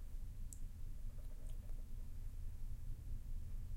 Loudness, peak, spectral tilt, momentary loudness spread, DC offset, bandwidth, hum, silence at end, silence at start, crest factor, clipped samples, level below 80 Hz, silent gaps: -54 LUFS; -34 dBFS; -6 dB/octave; 2 LU; under 0.1%; 15.5 kHz; none; 0 s; 0 s; 12 dB; under 0.1%; -46 dBFS; none